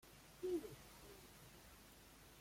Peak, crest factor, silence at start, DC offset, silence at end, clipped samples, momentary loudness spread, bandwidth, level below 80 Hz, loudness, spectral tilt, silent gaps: -34 dBFS; 18 dB; 0 s; under 0.1%; 0 s; under 0.1%; 17 LU; 16.5 kHz; -70 dBFS; -53 LUFS; -5 dB/octave; none